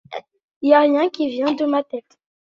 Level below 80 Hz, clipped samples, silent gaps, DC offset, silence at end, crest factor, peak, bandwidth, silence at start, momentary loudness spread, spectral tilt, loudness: -68 dBFS; under 0.1%; 0.44-0.61 s; under 0.1%; 0.4 s; 18 dB; -2 dBFS; 7.2 kHz; 0.1 s; 19 LU; -5 dB/octave; -18 LUFS